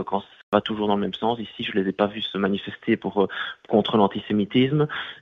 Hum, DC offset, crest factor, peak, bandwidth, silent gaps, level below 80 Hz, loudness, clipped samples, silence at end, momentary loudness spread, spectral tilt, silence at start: none; under 0.1%; 20 dB; -2 dBFS; 6 kHz; 0.43-0.52 s; -60 dBFS; -24 LUFS; under 0.1%; 0.05 s; 6 LU; -8 dB/octave; 0 s